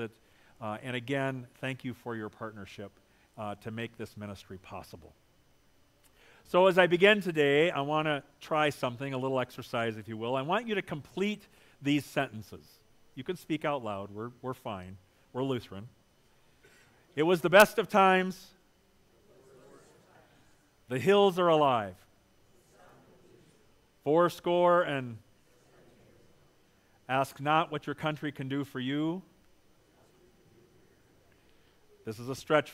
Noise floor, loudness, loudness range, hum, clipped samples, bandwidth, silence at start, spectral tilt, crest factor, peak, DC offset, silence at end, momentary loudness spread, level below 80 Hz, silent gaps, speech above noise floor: -65 dBFS; -29 LUFS; 14 LU; none; under 0.1%; 16 kHz; 0 s; -5.5 dB/octave; 28 dB; -4 dBFS; under 0.1%; 0 s; 20 LU; -70 dBFS; none; 36 dB